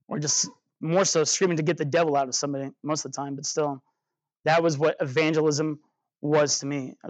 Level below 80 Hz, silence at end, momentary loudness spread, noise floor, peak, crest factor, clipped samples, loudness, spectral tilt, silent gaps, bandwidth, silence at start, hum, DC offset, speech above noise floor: -82 dBFS; 0 s; 10 LU; -85 dBFS; -10 dBFS; 14 dB; under 0.1%; -25 LUFS; -3.5 dB/octave; 4.40-4.44 s; 9.2 kHz; 0.1 s; none; under 0.1%; 61 dB